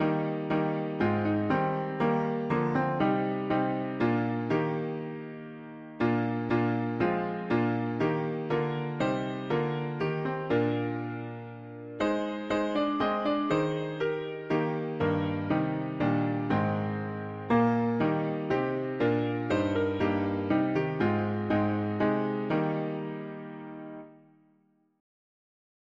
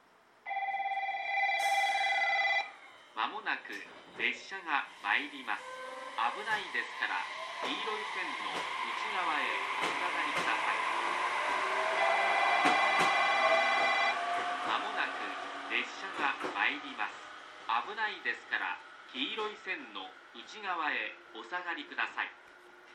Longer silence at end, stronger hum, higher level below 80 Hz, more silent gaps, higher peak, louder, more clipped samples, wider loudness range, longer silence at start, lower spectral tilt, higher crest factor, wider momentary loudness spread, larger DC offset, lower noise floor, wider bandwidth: first, 1.85 s vs 0 s; neither; first, -60 dBFS vs -82 dBFS; neither; about the same, -12 dBFS vs -14 dBFS; first, -29 LUFS vs -32 LUFS; neither; second, 3 LU vs 8 LU; second, 0 s vs 0.45 s; first, -8.5 dB/octave vs -1.5 dB/octave; about the same, 16 dB vs 20 dB; second, 9 LU vs 14 LU; neither; first, -68 dBFS vs -56 dBFS; second, 7.4 kHz vs 13.5 kHz